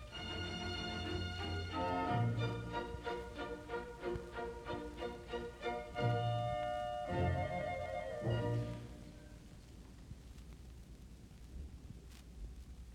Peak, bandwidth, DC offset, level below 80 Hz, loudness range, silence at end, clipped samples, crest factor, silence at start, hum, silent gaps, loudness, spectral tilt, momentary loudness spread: -24 dBFS; 12.5 kHz; under 0.1%; -54 dBFS; 16 LU; 0 s; under 0.1%; 18 dB; 0 s; none; none; -41 LUFS; -6.5 dB/octave; 19 LU